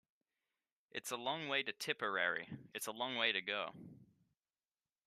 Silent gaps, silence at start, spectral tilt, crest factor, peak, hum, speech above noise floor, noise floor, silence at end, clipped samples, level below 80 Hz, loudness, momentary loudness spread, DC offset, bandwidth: none; 0.95 s; -2 dB/octave; 24 dB; -20 dBFS; none; over 49 dB; under -90 dBFS; 1.05 s; under 0.1%; -88 dBFS; -39 LUFS; 13 LU; under 0.1%; 13.5 kHz